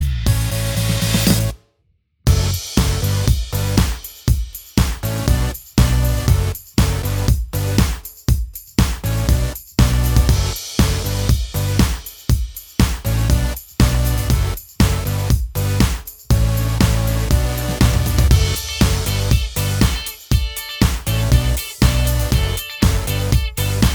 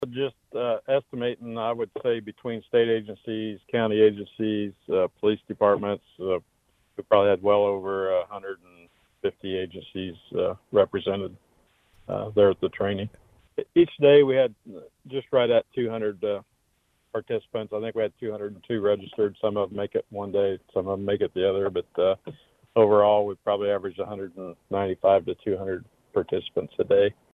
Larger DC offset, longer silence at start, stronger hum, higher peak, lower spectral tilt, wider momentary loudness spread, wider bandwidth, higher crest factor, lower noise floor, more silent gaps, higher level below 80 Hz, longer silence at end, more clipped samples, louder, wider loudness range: neither; about the same, 0 s vs 0 s; neither; first, 0 dBFS vs -6 dBFS; second, -5 dB/octave vs -8.5 dB/octave; second, 5 LU vs 14 LU; first, over 20 kHz vs 4 kHz; about the same, 16 dB vs 20 dB; second, -63 dBFS vs -70 dBFS; neither; first, -20 dBFS vs -64 dBFS; second, 0 s vs 0.2 s; neither; first, -18 LUFS vs -25 LUFS; second, 2 LU vs 6 LU